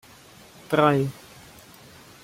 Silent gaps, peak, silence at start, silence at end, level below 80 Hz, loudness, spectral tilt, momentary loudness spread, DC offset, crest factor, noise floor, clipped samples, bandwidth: none; -4 dBFS; 0.7 s; 1.1 s; -62 dBFS; -22 LUFS; -6.5 dB/octave; 26 LU; under 0.1%; 22 dB; -50 dBFS; under 0.1%; 16 kHz